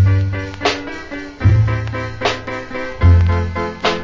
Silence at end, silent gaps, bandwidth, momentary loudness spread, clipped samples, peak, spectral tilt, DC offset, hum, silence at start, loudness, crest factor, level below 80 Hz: 0 s; none; 7.6 kHz; 13 LU; under 0.1%; 0 dBFS; -6.5 dB/octave; under 0.1%; none; 0 s; -17 LUFS; 16 dB; -22 dBFS